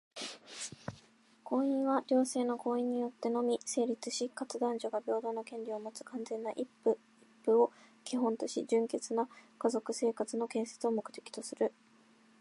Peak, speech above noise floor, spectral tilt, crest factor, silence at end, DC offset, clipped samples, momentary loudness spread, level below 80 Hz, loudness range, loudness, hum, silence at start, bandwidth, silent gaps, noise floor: -16 dBFS; 30 dB; -4 dB/octave; 18 dB; 0.7 s; under 0.1%; under 0.1%; 13 LU; -82 dBFS; 4 LU; -35 LUFS; none; 0.15 s; 11.5 kHz; none; -65 dBFS